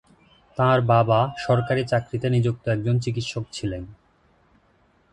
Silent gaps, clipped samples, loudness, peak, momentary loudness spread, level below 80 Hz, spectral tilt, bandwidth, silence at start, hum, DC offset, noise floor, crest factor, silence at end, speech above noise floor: none; under 0.1%; -23 LUFS; -4 dBFS; 12 LU; -50 dBFS; -7 dB/octave; 9.8 kHz; 0.55 s; none; under 0.1%; -61 dBFS; 18 dB; 1.2 s; 40 dB